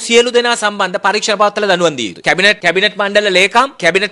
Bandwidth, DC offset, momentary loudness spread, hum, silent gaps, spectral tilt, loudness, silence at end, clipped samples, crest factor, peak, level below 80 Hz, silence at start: 11.5 kHz; under 0.1%; 5 LU; none; none; -2.5 dB/octave; -12 LUFS; 0 s; 0.2%; 12 dB; 0 dBFS; -54 dBFS; 0 s